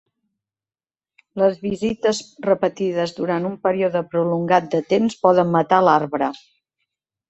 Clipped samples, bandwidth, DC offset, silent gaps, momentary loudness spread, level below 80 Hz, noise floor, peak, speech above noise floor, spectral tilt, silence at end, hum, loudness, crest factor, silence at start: under 0.1%; 8.2 kHz; under 0.1%; none; 8 LU; -60 dBFS; under -90 dBFS; -2 dBFS; over 71 dB; -6 dB/octave; 0.9 s; none; -20 LUFS; 20 dB; 1.35 s